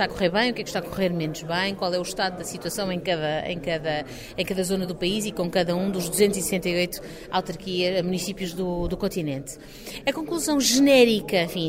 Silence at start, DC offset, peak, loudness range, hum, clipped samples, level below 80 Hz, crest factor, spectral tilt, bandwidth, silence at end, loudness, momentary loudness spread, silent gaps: 0 s; under 0.1%; -6 dBFS; 5 LU; none; under 0.1%; -46 dBFS; 20 dB; -4 dB/octave; 16 kHz; 0 s; -24 LUFS; 10 LU; none